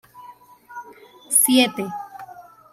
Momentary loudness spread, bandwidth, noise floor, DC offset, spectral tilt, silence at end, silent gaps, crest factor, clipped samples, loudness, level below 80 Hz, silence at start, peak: 25 LU; 16 kHz; -46 dBFS; under 0.1%; -1.5 dB/octave; 0.3 s; none; 22 dB; under 0.1%; -18 LUFS; -70 dBFS; 0.15 s; -2 dBFS